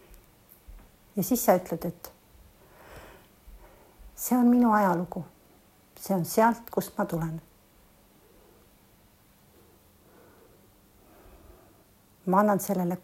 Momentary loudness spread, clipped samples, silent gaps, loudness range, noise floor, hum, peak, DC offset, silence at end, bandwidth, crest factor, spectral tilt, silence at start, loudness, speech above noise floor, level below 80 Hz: 25 LU; under 0.1%; none; 11 LU; -60 dBFS; none; -8 dBFS; under 0.1%; 0.05 s; 16 kHz; 22 dB; -6 dB/octave; 0.1 s; -26 LUFS; 35 dB; -58 dBFS